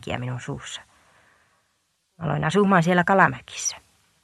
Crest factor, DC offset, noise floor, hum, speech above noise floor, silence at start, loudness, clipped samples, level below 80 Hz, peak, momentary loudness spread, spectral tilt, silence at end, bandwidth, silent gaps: 22 dB; under 0.1%; -71 dBFS; none; 49 dB; 0.05 s; -22 LUFS; under 0.1%; -56 dBFS; -2 dBFS; 17 LU; -5 dB/octave; 0.45 s; 12.5 kHz; none